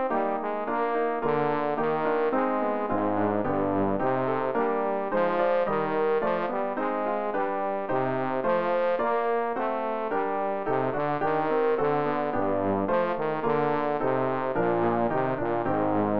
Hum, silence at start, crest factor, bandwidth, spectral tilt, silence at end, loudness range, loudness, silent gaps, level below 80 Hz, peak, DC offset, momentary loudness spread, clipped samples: none; 0 s; 14 dB; 5.4 kHz; -9.5 dB/octave; 0 s; 1 LU; -26 LUFS; none; -58 dBFS; -12 dBFS; 0.8%; 3 LU; under 0.1%